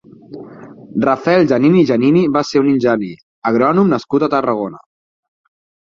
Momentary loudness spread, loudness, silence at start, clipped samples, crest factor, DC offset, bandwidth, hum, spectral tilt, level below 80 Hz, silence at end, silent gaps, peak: 14 LU; -14 LUFS; 0.3 s; under 0.1%; 14 dB; under 0.1%; 7.4 kHz; none; -7.5 dB/octave; -56 dBFS; 1.1 s; 3.23-3.42 s; -2 dBFS